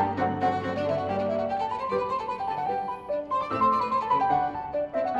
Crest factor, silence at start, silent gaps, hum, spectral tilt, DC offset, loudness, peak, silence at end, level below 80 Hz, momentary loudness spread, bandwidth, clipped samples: 14 dB; 0 s; none; none; -7 dB/octave; under 0.1%; -27 LUFS; -12 dBFS; 0 s; -58 dBFS; 6 LU; 8.4 kHz; under 0.1%